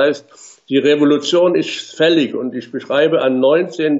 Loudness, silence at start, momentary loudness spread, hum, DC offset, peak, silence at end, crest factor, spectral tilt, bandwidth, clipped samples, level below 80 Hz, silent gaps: -15 LUFS; 0 s; 10 LU; none; under 0.1%; -2 dBFS; 0 s; 12 dB; -5 dB/octave; 8 kHz; under 0.1%; -68 dBFS; none